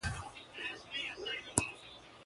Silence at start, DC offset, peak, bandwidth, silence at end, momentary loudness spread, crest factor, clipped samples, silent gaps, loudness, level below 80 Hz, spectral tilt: 0 s; under 0.1%; -6 dBFS; 11.5 kHz; 0 s; 14 LU; 36 dB; under 0.1%; none; -39 LUFS; -56 dBFS; -2 dB/octave